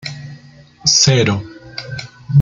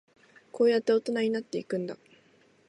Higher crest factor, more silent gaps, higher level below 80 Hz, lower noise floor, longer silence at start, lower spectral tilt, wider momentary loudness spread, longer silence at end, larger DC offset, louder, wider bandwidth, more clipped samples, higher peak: about the same, 16 dB vs 16 dB; neither; first, -48 dBFS vs -82 dBFS; second, -42 dBFS vs -63 dBFS; second, 0.05 s vs 0.55 s; second, -3.5 dB/octave vs -5.5 dB/octave; first, 21 LU vs 17 LU; second, 0 s vs 0.75 s; neither; first, -13 LUFS vs -28 LUFS; second, 9.2 kHz vs 11 kHz; neither; first, 0 dBFS vs -14 dBFS